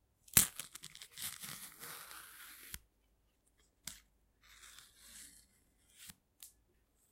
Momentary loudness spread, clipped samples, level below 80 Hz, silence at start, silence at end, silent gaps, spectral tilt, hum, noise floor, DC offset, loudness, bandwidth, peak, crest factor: 28 LU; under 0.1%; -66 dBFS; 0.35 s; 0.65 s; none; -0.5 dB/octave; none; -76 dBFS; under 0.1%; -36 LUFS; 16.5 kHz; -6 dBFS; 38 dB